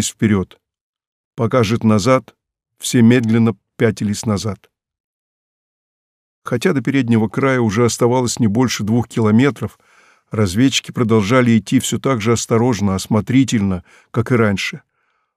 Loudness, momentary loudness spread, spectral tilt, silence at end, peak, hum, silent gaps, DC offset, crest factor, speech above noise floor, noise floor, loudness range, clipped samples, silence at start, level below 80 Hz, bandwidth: -16 LUFS; 11 LU; -5.5 dB/octave; 0.6 s; -2 dBFS; none; 0.81-0.94 s, 1.07-1.31 s, 5.00-6.42 s; under 0.1%; 16 dB; over 75 dB; under -90 dBFS; 5 LU; under 0.1%; 0 s; -52 dBFS; 15.5 kHz